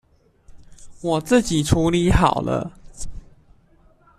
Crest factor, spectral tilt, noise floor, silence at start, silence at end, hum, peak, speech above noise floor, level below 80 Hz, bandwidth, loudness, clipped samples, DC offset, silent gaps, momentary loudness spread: 20 dB; -5.5 dB/octave; -55 dBFS; 0.5 s; 1 s; none; -2 dBFS; 36 dB; -34 dBFS; 14 kHz; -20 LUFS; under 0.1%; under 0.1%; none; 20 LU